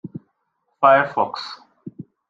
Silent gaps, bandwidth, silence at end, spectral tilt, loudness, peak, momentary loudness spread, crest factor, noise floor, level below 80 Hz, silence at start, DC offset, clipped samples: none; 7.4 kHz; 0.3 s; -6 dB/octave; -18 LUFS; -2 dBFS; 24 LU; 20 dB; -72 dBFS; -72 dBFS; 0.05 s; under 0.1%; under 0.1%